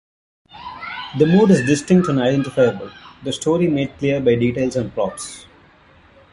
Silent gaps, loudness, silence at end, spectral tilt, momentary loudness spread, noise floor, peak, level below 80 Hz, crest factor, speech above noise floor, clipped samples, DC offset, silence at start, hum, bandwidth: none; -18 LUFS; 0.9 s; -6.5 dB/octave; 18 LU; -50 dBFS; -2 dBFS; -50 dBFS; 16 dB; 33 dB; under 0.1%; under 0.1%; 0.55 s; none; 11.5 kHz